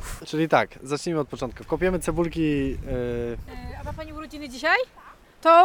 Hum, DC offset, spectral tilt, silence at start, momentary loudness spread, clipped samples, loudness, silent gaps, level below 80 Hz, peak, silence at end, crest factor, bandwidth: none; under 0.1%; -5.5 dB/octave; 0 s; 14 LU; under 0.1%; -25 LUFS; none; -40 dBFS; -4 dBFS; 0 s; 20 dB; 18 kHz